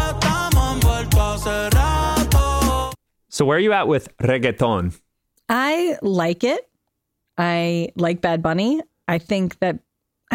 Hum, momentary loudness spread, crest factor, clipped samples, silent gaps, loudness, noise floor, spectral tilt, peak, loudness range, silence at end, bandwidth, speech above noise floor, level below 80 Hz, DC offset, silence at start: none; 7 LU; 16 dB; under 0.1%; none; -20 LUFS; -76 dBFS; -5.5 dB/octave; -4 dBFS; 3 LU; 0 s; 17 kHz; 56 dB; -26 dBFS; under 0.1%; 0 s